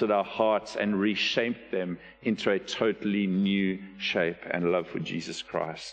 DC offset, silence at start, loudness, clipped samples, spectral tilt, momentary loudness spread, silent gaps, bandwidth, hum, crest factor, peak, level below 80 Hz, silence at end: under 0.1%; 0 s; -28 LUFS; under 0.1%; -5.5 dB/octave; 8 LU; none; 9 kHz; none; 18 dB; -10 dBFS; -64 dBFS; 0 s